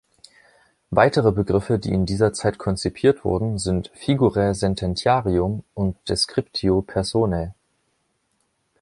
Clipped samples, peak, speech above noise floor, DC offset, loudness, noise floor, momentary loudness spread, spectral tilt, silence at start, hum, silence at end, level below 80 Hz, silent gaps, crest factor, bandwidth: under 0.1%; -2 dBFS; 49 dB; under 0.1%; -21 LUFS; -70 dBFS; 7 LU; -6 dB/octave; 0.9 s; none; 1.3 s; -40 dBFS; none; 20 dB; 11.5 kHz